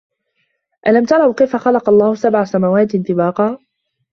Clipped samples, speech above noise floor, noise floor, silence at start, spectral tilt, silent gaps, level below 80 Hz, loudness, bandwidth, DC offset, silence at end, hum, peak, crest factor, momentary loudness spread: under 0.1%; 54 dB; -67 dBFS; 0.85 s; -8 dB/octave; none; -58 dBFS; -14 LUFS; 7 kHz; under 0.1%; 0.55 s; none; 0 dBFS; 14 dB; 7 LU